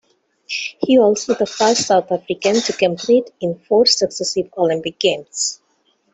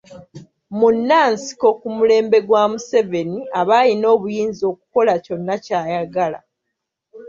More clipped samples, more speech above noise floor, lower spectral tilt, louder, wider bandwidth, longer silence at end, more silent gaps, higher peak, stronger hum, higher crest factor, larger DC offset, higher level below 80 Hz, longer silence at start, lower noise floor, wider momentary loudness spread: neither; second, 46 dB vs 62 dB; second, -3 dB/octave vs -5 dB/octave; about the same, -17 LUFS vs -17 LUFS; first, 8.4 kHz vs 7.4 kHz; first, 0.6 s vs 0 s; neither; about the same, -2 dBFS vs -2 dBFS; neither; about the same, 16 dB vs 16 dB; neither; about the same, -62 dBFS vs -62 dBFS; first, 0.5 s vs 0.1 s; second, -62 dBFS vs -78 dBFS; about the same, 10 LU vs 9 LU